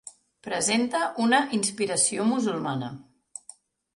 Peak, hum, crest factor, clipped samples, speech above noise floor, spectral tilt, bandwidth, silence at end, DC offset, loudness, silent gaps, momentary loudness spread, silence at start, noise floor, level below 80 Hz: -8 dBFS; none; 18 dB; under 0.1%; 27 dB; -3 dB/octave; 11.5 kHz; 0.95 s; under 0.1%; -25 LUFS; none; 21 LU; 0.05 s; -53 dBFS; -70 dBFS